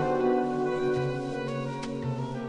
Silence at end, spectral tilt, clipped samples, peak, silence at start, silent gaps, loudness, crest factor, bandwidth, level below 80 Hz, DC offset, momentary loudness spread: 0 s; -7.5 dB/octave; under 0.1%; -14 dBFS; 0 s; none; -29 LUFS; 14 dB; 10.5 kHz; -54 dBFS; under 0.1%; 7 LU